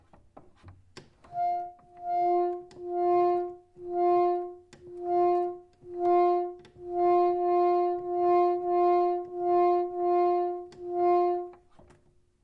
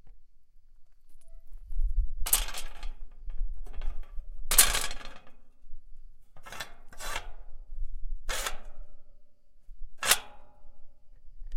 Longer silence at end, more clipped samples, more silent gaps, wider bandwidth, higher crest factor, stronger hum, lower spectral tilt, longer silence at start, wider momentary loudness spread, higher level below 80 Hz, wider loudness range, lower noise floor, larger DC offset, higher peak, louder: first, 0.9 s vs 0 s; neither; neither; second, 5.4 kHz vs 16.5 kHz; second, 12 dB vs 28 dB; neither; first, -8 dB/octave vs 0 dB/octave; first, 0.65 s vs 0.05 s; second, 15 LU vs 24 LU; second, -68 dBFS vs -36 dBFS; second, 4 LU vs 12 LU; first, -63 dBFS vs -50 dBFS; neither; second, -14 dBFS vs -2 dBFS; about the same, -27 LUFS vs -29 LUFS